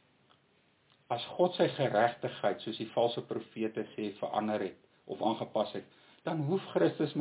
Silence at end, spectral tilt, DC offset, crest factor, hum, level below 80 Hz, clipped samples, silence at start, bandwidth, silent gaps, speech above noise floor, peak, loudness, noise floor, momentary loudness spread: 0 s; -4.5 dB/octave; under 0.1%; 20 dB; none; -80 dBFS; under 0.1%; 1.1 s; 4 kHz; none; 37 dB; -14 dBFS; -33 LUFS; -69 dBFS; 10 LU